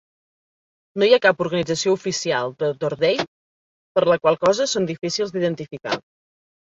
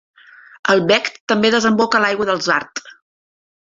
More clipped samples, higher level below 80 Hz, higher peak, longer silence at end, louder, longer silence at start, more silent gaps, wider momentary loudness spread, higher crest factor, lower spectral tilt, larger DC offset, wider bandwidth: neither; about the same, -62 dBFS vs -60 dBFS; about the same, -2 dBFS vs 0 dBFS; about the same, 0.75 s vs 0.7 s; second, -21 LUFS vs -16 LUFS; first, 0.95 s vs 0.65 s; first, 3.28-3.95 s vs 1.20-1.27 s; first, 11 LU vs 8 LU; about the same, 20 dB vs 18 dB; about the same, -4 dB/octave vs -4 dB/octave; neither; about the same, 7.8 kHz vs 7.8 kHz